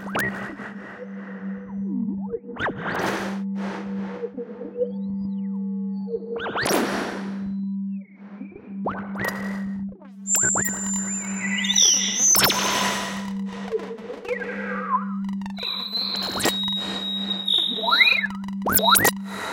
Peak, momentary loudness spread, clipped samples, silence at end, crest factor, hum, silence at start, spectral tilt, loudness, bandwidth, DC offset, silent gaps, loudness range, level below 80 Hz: -2 dBFS; 18 LU; under 0.1%; 0 s; 24 dB; none; 0 s; -2 dB/octave; -23 LUFS; 17 kHz; under 0.1%; none; 10 LU; -56 dBFS